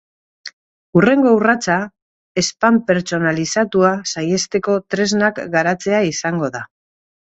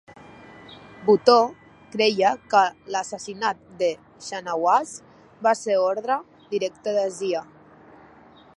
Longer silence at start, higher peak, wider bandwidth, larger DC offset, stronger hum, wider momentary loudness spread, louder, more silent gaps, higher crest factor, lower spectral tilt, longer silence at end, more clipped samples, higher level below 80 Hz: second, 0.45 s vs 0.7 s; about the same, 0 dBFS vs 0 dBFS; second, 8.2 kHz vs 11.5 kHz; neither; neither; about the same, 16 LU vs 16 LU; first, -17 LUFS vs -23 LUFS; first, 0.53-0.93 s, 2.02-2.35 s vs none; second, 18 dB vs 24 dB; about the same, -4.5 dB/octave vs -3.5 dB/octave; second, 0.75 s vs 1.15 s; neither; first, -56 dBFS vs -68 dBFS